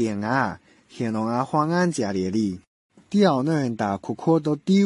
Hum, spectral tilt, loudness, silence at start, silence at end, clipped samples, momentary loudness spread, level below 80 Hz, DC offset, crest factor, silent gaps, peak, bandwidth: none; -6.5 dB/octave; -23 LUFS; 0 s; 0 s; under 0.1%; 9 LU; -56 dBFS; under 0.1%; 16 dB; 2.67-2.90 s; -6 dBFS; 11.5 kHz